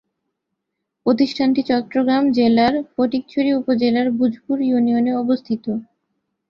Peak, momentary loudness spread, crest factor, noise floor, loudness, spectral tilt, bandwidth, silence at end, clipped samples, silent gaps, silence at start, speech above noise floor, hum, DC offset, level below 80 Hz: -4 dBFS; 6 LU; 14 dB; -78 dBFS; -19 LUFS; -7 dB/octave; 6.8 kHz; 0.65 s; under 0.1%; none; 1.05 s; 61 dB; none; under 0.1%; -58 dBFS